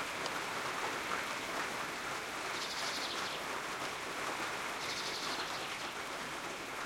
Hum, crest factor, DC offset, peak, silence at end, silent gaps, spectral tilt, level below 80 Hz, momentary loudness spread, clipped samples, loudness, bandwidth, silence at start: none; 18 dB; under 0.1%; -22 dBFS; 0 s; none; -1.5 dB/octave; -68 dBFS; 3 LU; under 0.1%; -38 LUFS; 16.5 kHz; 0 s